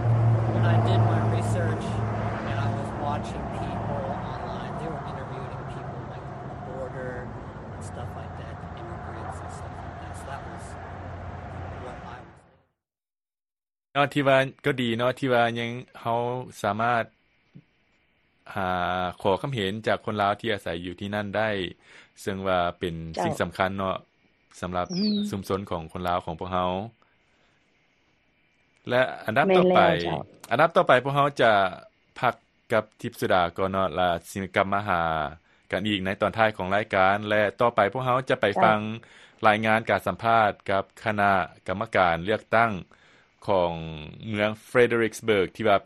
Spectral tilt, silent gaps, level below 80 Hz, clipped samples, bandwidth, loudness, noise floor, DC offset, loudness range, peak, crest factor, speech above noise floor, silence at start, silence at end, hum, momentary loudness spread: -6.5 dB/octave; none; -50 dBFS; under 0.1%; 12.5 kHz; -25 LUFS; under -90 dBFS; under 0.1%; 14 LU; -4 dBFS; 24 dB; over 65 dB; 0 s; 0 s; none; 16 LU